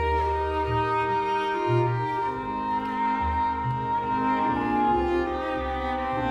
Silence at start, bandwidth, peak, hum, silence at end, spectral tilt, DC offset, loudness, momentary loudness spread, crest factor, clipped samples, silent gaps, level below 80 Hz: 0 s; 10 kHz; -12 dBFS; none; 0 s; -7.5 dB/octave; under 0.1%; -26 LUFS; 4 LU; 14 dB; under 0.1%; none; -40 dBFS